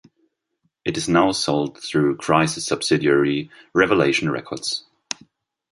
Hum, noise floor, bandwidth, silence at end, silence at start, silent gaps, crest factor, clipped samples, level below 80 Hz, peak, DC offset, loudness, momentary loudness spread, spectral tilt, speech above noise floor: none; -72 dBFS; 11.5 kHz; 0.9 s; 0.85 s; none; 20 dB; under 0.1%; -54 dBFS; -2 dBFS; under 0.1%; -20 LUFS; 12 LU; -4.5 dB/octave; 52 dB